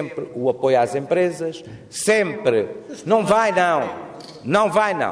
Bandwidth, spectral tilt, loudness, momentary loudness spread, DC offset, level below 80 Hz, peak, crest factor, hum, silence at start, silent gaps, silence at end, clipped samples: 11 kHz; -4.5 dB/octave; -20 LUFS; 15 LU; under 0.1%; -60 dBFS; -4 dBFS; 16 dB; none; 0 s; none; 0 s; under 0.1%